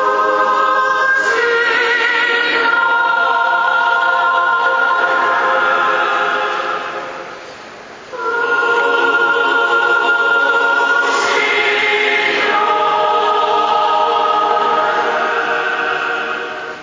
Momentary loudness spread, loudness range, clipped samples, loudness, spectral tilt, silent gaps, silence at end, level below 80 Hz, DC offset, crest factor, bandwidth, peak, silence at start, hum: 8 LU; 4 LU; under 0.1%; -13 LUFS; -2 dB/octave; none; 0 s; -62 dBFS; under 0.1%; 14 dB; 7.6 kHz; -2 dBFS; 0 s; none